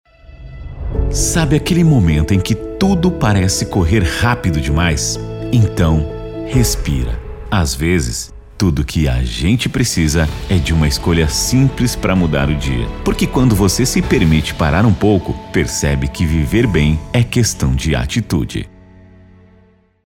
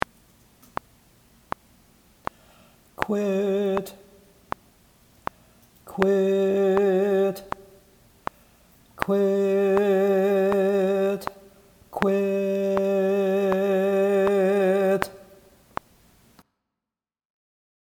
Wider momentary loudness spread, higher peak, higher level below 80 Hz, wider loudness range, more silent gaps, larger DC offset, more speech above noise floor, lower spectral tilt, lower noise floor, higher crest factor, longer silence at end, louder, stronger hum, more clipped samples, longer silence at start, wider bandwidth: second, 7 LU vs 18 LU; about the same, -2 dBFS vs 0 dBFS; first, -24 dBFS vs -58 dBFS; second, 3 LU vs 7 LU; neither; neither; second, 36 dB vs 68 dB; second, -5 dB/octave vs -7 dB/octave; second, -50 dBFS vs -89 dBFS; second, 14 dB vs 24 dB; second, 1.45 s vs 2.7 s; first, -15 LUFS vs -23 LUFS; neither; neither; second, 0.3 s vs 3 s; about the same, 17 kHz vs 17 kHz